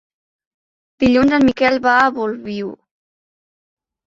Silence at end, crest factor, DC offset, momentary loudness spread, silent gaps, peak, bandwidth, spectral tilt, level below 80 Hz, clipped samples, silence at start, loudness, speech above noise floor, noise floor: 1.3 s; 18 dB; under 0.1%; 13 LU; none; 0 dBFS; 7.6 kHz; -6 dB/octave; -48 dBFS; under 0.1%; 1 s; -15 LUFS; over 75 dB; under -90 dBFS